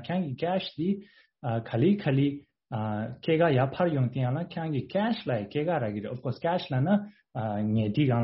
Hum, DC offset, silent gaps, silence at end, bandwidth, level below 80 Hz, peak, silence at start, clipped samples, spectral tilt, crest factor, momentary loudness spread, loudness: none; under 0.1%; none; 0 s; 5.8 kHz; -62 dBFS; -12 dBFS; 0 s; under 0.1%; -6.5 dB/octave; 16 dB; 9 LU; -29 LUFS